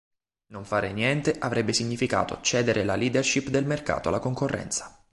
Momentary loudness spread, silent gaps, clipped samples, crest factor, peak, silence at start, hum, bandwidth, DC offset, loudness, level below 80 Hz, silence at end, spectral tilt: 6 LU; none; under 0.1%; 18 dB; -8 dBFS; 0.5 s; none; 11.5 kHz; under 0.1%; -26 LUFS; -52 dBFS; 0.2 s; -4 dB/octave